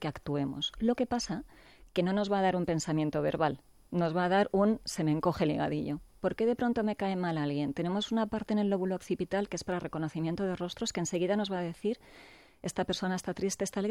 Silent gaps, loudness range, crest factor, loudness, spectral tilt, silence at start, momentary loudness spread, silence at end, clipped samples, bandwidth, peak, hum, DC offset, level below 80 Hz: none; 4 LU; 16 dB; -32 LUFS; -5.5 dB/octave; 0 s; 7 LU; 0 s; under 0.1%; 14.5 kHz; -16 dBFS; none; under 0.1%; -58 dBFS